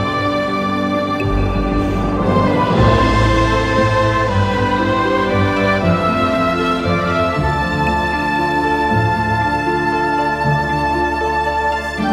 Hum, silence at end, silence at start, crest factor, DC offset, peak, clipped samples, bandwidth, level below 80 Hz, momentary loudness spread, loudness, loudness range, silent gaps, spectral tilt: none; 0 s; 0 s; 16 dB; under 0.1%; 0 dBFS; under 0.1%; 13 kHz; -28 dBFS; 4 LU; -16 LUFS; 2 LU; none; -6.5 dB/octave